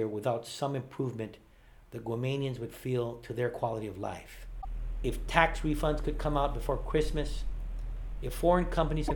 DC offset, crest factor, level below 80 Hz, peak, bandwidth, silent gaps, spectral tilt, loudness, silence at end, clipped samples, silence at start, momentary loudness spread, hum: under 0.1%; 26 dB; -38 dBFS; -6 dBFS; 19 kHz; none; -6 dB/octave; -33 LUFS; 0 s; under 0.1%; 0 s; 15 LU; none